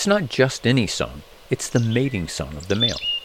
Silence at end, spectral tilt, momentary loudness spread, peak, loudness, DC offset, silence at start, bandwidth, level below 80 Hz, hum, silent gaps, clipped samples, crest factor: 0 s; -4.5 dB/octave; 10 LU; -4 dBFS; -22 LUFS; under 0.1%; 0 s; 16 kHz; -44 dBFS; none; none; under 0.1%; 18 dB